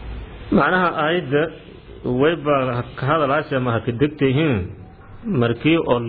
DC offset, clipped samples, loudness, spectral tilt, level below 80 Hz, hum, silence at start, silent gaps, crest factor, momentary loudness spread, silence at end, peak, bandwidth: under 0.1%; under 0.1%; -19 LUFS; -10.5 dB/octave; -42 dBFS; none; 0 s; none; 16 dB; 15 LU; 0 s; -4 dBFS; 4.8 kHz